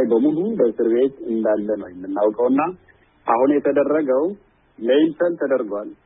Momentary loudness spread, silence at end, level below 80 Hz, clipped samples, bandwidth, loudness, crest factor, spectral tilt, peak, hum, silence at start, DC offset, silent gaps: 10 LU; 0.1 s; -62 dBFS; under 0.1%; 3.9 kHz; -20 LUFS; 16 dB; -11 dB/octave; -4 dBFS; none; 0 s; under 0.1%; none